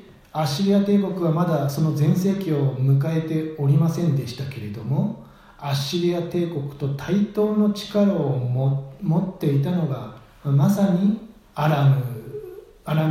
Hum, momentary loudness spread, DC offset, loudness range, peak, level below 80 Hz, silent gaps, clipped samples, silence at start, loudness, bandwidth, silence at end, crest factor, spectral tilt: none; 12 LU; under 0.1%; 3 LU; -8 dBFS; -56 dBFS; none; under 0.1%; 0.35 s; -22 LUFS; 16 kHz; 0 s; 14 dB; -7.5 dB/octave